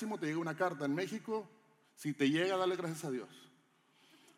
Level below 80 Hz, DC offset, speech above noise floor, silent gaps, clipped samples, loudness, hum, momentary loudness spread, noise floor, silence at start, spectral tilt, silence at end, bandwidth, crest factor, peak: under -90 dBFS; under 0.1%; 34 dB; none; under 0.1%; -37 LUFS; none; 11 LU; -70 dBFS; 0 s; -5.5 dB/octave; 0.9 s; 16 kHz; 18 dB; -20 dBFS